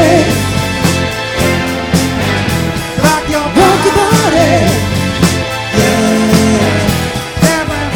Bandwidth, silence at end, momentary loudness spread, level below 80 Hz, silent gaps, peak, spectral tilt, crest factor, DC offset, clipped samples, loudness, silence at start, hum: 19.5 kHz; 0 s; 5 LU; -28 dBFS; none; 0 dBFS; -5 dB/octave; 10 dB; under 0.1%; 0.7%; -11 LUFS; 0 s; none